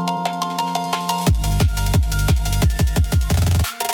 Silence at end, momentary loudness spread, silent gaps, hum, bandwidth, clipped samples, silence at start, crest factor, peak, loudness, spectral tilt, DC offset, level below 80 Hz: 0 s; 4 LU; none; none; 18 kHz; under 0.1%; 0 s; 14 dB; -4 dBFS; -19 LUFS; -5 dB/octave; under 0.1%; -22 dBFS